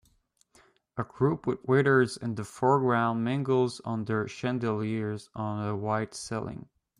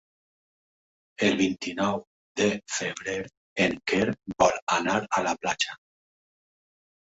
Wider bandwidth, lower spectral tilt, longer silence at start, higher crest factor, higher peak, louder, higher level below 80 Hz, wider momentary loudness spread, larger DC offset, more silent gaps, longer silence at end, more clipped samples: first, 11.5 kHz vs 8.2 kHz; first, -6.5 dB/octave vs -3.5 dB/octave; second, 0.95 s vs 1.2 s; second, 18 dB vs 24 dB; second, -10 dBFS vs -6 dBFS; about the same, -29 LUFS vs -27 LUFS; about the same, -64 dBFS vs -60 dBFS; about the same, 11 LU vs 9 LU; neither; second, none vs 2.07-2.35 s, 3.37-3.56 s, 4.62-4.67 s; second, 0.35 s vs 1.35 s; neither